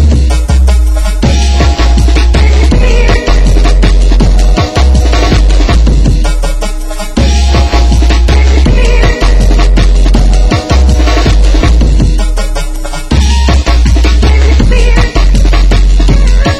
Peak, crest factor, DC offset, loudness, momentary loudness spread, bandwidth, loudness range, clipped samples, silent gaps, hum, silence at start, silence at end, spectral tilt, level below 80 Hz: 0 dBFS; 6 dB; under 0.1%; -8 LUFS; 4 LU; 11.5 kHz; 1 LU; 0.7%; none; none; 0 s; 0 s; -5.5 dB/octave; -6 dBFS